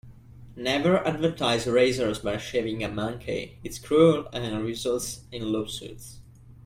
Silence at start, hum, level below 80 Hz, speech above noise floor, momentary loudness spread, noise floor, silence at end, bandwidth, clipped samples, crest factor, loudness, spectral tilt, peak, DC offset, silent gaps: 0.05 s; none; -52 dBFS; 21 dB; 14 LU; -47 dBFS; 0.05 s; 16 kHz; under 0.1%; 20 dB; -26 LUFS; -5 dB/octave; -6 dBFS; under 0.1%; none